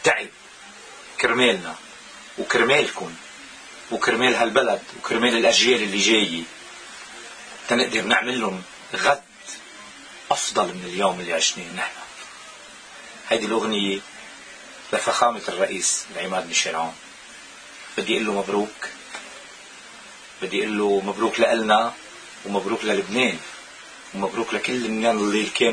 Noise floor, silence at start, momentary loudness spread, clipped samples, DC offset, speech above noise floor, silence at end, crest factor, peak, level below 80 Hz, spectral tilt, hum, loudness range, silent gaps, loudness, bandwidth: -43 dBFS; 0 s; 22 LU; under 0.1%; under 0.1%; 21 dB; 0 s; 22 dB; -2 dBFS; -62 dBFS; -2.5 dB/octave; none; 6 LU; none; -22 LUFS; 10.5 kHz